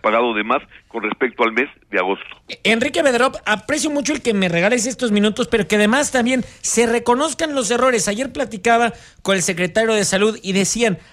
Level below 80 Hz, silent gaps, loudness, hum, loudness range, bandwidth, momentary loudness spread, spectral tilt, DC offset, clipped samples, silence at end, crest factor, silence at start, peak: -50 dBFS; none; -18 LUFS; none; 2 LU; 15.5 kHz; 6 LU; -3.5 dB/octave; under 0.1%; under 0.1%; 0.1 s; 14 dB; 0.05 s; -4 dBFS